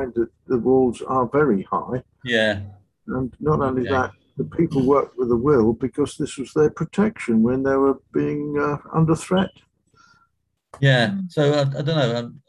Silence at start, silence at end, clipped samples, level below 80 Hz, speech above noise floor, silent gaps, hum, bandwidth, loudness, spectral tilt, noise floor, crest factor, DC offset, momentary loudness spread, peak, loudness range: 0 s; 0.1 s; under 0.1%; -48 dBFS; 50 dB; none; none; 11.5 kHz; -21 LUFS; -7 dB/octave; -70 dBFS; 18 dB; under 0.1%; 10 LU; -4 dBFS; 3 LU